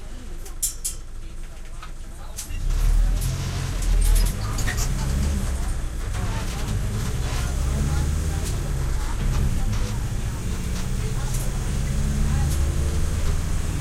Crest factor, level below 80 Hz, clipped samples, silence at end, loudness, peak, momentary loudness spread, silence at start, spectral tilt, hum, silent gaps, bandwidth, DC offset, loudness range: 14 dB; -24 dBFS; under 0.1%; 0 s; -26 LUFS; -8 dBFS; 14 LU; 0 s; -4.5 dB/octave; none; none; 16 kHz; under 0.1%; 3 LU